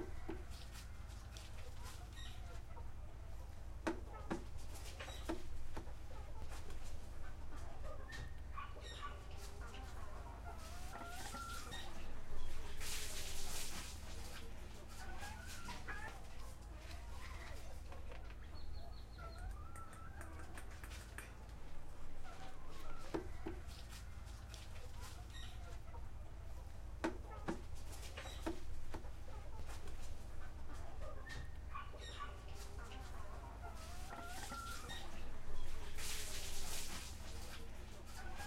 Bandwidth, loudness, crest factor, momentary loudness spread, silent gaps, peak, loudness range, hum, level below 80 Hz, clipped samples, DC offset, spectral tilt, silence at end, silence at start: 15.5 kHz; -51 LUFS; 20 dB; 8 LU; none; -24 dBFS; 5 LU; none; -50 dBFS; under 0.1%; under 0.1%; -4 dB/octave; 0 s; 0 s